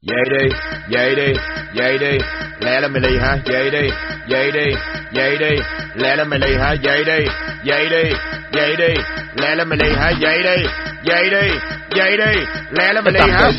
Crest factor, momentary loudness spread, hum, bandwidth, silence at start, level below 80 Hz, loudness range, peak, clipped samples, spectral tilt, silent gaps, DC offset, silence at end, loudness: 16 dB; 8 LU; none; 6 kHz; 0.05 s; -30 dBFS; 2 LU; 0 dBFS; under 0.1%; -2.5 dB/octave; none; under 0.1%; 0 s; -16 LUFS